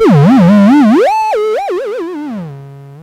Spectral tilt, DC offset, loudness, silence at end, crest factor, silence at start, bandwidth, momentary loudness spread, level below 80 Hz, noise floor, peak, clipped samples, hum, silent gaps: -8 dB/octave; under 0.1%; -9 LUFS; 0 s; 10 dB; 0 s; 12 kHz; 16 LU; -50 dBFS; -30 dBFS; 0 dBFS; under 0.1%; none; none